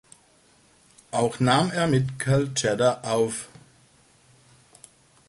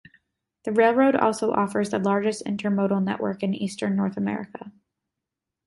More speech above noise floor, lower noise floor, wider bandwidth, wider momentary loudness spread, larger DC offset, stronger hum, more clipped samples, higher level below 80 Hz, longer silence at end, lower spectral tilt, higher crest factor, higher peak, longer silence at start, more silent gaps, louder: second, 36 dB vs 62 dB; second, -59 dBFS vs -86 dBFS; about the same, 11.5 kHz vs 11.5 kHz; about the same, 8 LU vs 9 LU; neither; neither; neither; first, -56 dBFS vs -66 dBFS; first, 1.8 s vs 0.95 s; second, -5 dB/octave vs -6.5 dB/octave; about the same, 20 dB vs 20 dB; about the same, -8 dBFS vs -6 dBFS; first, 1.15 s vs 0.65 s; neither; about the same, -24 LUFS vs -24 LUFS